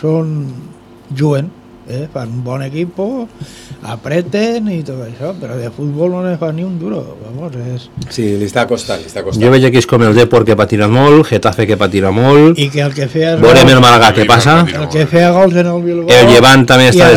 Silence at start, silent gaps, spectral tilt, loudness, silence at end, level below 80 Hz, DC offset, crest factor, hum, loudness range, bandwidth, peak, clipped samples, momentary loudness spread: 0 s; none; -5.5 dB/octave; -9 LUFS; 0 s; -38 dBFS; under 0.1%; 10 dB; none; 13 LU; 18 kHz; 0 dBFS; 4%; 19 LU